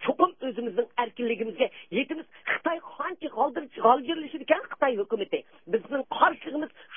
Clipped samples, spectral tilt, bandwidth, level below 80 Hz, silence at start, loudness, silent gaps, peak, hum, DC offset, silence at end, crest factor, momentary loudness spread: under 0.1%; -8.5 dB/octave; 3.8 kHz; -76 dBFS; 0 s; -28 LUFS; none; -6 dBFS; none; 0.1%; 0 s; 22 dB; 10 LU